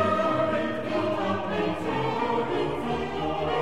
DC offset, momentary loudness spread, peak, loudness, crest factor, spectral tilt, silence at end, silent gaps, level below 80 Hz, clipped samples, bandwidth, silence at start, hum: 0.7%; 4 LU; -12 dBFS; -27 LUFS; 14 dB; -6.5 dB/octave; 0 s; none; -52 dBFS; under 0.1%; 14.5 kHz; 0 s; none